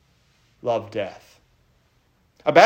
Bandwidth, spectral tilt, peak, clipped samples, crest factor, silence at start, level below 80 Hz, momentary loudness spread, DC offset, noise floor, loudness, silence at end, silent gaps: 15.5 kHz; -4.5 dB/octave; 0 dBFS; under 0.1%; 22 dB; 0.65 s; -66 dBFS; 12 LU; under 0.1%; -63 dBFS; -26 LUFS; 0 s; none